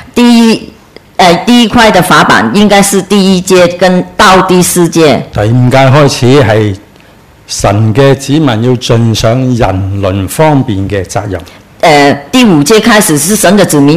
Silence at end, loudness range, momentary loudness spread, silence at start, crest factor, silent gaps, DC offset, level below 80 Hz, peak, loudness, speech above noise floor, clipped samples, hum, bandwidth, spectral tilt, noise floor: 0 s; 4 LU; 8 LU; 0 s; 6 dB; none; under 0.1%; -32 dBFS; 0 dBFS; -6 LUFS; 32 dB; 6%; none; 16.5 kHz; -5 dB/octave; -37 dBFS